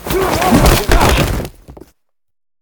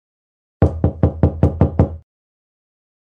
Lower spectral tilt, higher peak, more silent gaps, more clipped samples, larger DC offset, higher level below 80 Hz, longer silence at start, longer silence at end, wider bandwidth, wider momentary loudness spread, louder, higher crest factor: second, -4.5 dB/octave vs -11.5 dB/octave; about the same, 0 dBFS vs -2 dBFS; neither; neither; neither; first, -20 dBFS vs -28 dBFS; second, 0 s vs 0.6 s; second, 0.9 s vs 1.05 s; first, over 20 kHz vs 3.4 kHz; first, 11 LU vs 4 LU; first, -12 LUFS vs -18 LUFS; about the same, 14 dB vs 18 dB